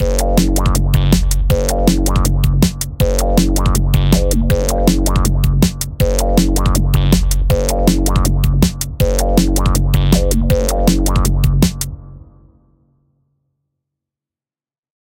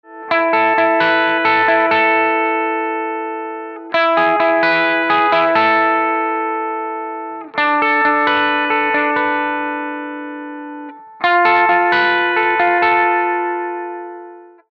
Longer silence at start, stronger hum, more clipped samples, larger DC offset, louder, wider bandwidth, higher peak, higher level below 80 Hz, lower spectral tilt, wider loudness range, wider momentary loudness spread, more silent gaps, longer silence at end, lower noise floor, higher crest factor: about the same, 0 s vs 0.1 s; neither; neither; neither; about the same, -15 LUFS vs -15 LUFS; first, 17 kHz vs 6.2 kHz; about the same, 0 dBFS vs -2 dBFS; first, -16 dBFS vs -66 dBFS; about the same, -5.5 dB/octave vs -5.5 dB/octave; about the same, 4 LU vs 2 LU; second, 3 LU vs 14 LU; neither; first, 2.85 s vs 0.25 s; first, under -90 dBFS vs -37 dBFS; about the same, 14 dB vs 14 dB